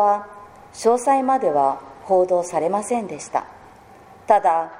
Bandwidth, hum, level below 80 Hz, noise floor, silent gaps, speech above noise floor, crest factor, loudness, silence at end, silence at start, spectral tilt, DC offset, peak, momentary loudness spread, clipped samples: 15 kHz; none; -62 dBFS; -46 dBFS; none; 27 dB; 18 dB; -20 LUFS; 0 s; 0 s; -5 dB/octave; under 0.1%; -2 dBFS; 10 LU; under 0.1%